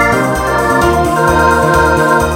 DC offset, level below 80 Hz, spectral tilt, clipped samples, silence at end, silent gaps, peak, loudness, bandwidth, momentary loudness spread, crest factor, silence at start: under 0.1%; -24 dBFS; -5.5 dB/octave; under 0.1%; 0 s; none; 0 dBFS; -10 LUFS; 17.5 kHz; 3 LU; 10 dB; 0 s